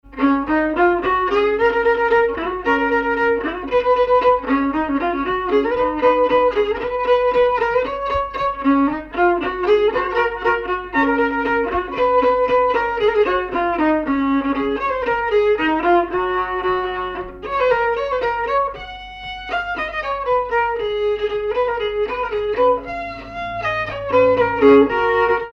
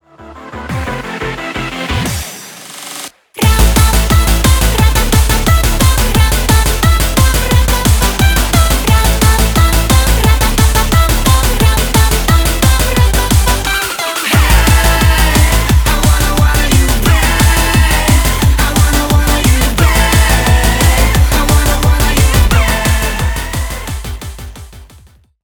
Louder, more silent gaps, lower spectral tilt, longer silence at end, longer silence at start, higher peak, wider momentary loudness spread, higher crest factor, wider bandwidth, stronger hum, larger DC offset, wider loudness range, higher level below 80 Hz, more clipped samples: second, -18 LUFS vs -11 LUFS; neither; first, -6.5 dB/octave vs -4 dB/octave; second, 0 s vs 0.6 s; second, 0.05 s vs 0.2 s; about the same, -2 dBFS vs 0 dBFS; second, 7 LU vs 11 LU; first, 16 dB vs 10 dB; second, 6.6 kHz vs over 20 kHz; neither; neither; about the same, 4 LU vs 3 LU; second, -42 dBFS vs -12 dBFS; neither